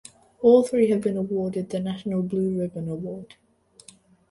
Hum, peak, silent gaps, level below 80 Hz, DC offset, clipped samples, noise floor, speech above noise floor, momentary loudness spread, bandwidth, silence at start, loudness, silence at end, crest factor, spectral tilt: none; -4 dBFS; none; -62 dBFS; under 0.1%; under 0.1%; -53 dBFS; 30 dB; 14 LU; 11.5 kHz; 0.4 s; -24 LUFS; 1.05 s; 20 dB; -7.5 dB/octave